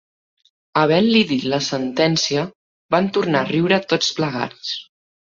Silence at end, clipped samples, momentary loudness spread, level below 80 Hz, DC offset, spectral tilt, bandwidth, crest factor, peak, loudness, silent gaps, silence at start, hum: 0.4 s; under 0.1%; 10 LU; -60 dBFS; under 0.1%; -4.5 dB/octave; 7.6 kHz; 18 dB; -2 dBFS; -19 LUFS; 2.55-2.89 s; 0.75 s; none